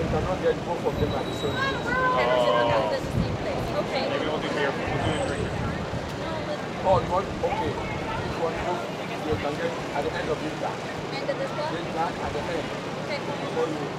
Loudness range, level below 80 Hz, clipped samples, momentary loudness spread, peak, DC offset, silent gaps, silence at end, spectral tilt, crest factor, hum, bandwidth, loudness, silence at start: 4 LU; -44 dBFS; under 0.1%; 8 LU; -8 dBFS; under 0.1%; none; 0 s; -5.5 dB/octave; 18 dB; none; 15.5 kHz; -27 LUFS; 0 s